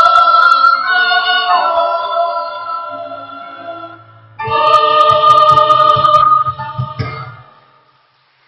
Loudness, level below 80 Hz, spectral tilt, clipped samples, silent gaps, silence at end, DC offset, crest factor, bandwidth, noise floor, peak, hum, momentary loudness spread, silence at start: -10 LUFS; -48 dBFS; -4 dB/octave; under 0.1%; none; 1.1 s; under 0.1%; 12 dB; 10 kHz; -54 dBFS; 0 dBFS; none; 21 LU; 0 s